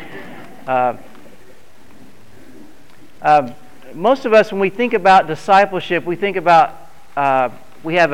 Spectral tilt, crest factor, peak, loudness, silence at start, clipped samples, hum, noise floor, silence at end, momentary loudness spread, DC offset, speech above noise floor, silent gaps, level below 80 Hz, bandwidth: -5.5 dB/octave; 14 dB; -2 dBFS; -15 LUFS; 0 s; under 0.1%; none; -47 dBFS; 0 s; 19 LU; 2%; 33 dB; none; -54 dBFS; 15.5 kHz